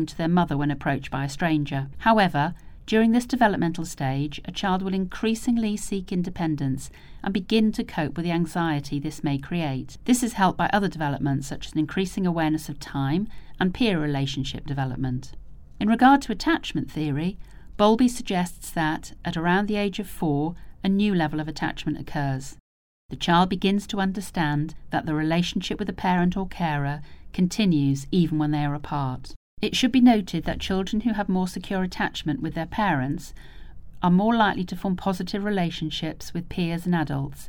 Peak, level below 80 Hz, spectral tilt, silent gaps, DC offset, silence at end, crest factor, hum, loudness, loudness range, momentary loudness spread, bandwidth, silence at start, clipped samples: -4 dBFS; -44 dBFS; -6 dB/octave; 22.60-23.09 s, 29.36-29.57 s; under 0.1%; 0 s; 20 dB; none; -25 LUFS; 3 LU; 9 LU; 19 kHz; 0 s; under 0.1%